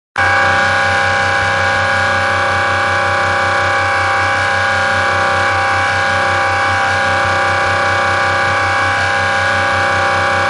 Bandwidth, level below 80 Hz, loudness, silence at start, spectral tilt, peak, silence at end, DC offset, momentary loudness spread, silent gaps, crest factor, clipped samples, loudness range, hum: 11.5 kHz; -36 dBFS; -13 LUFS; 0.15 s; -3.5 dB/octave; -2 dBFS; 0 s; under 0.1%; 1 LU; none; 10 dB; under 0.1%; 0 LU; none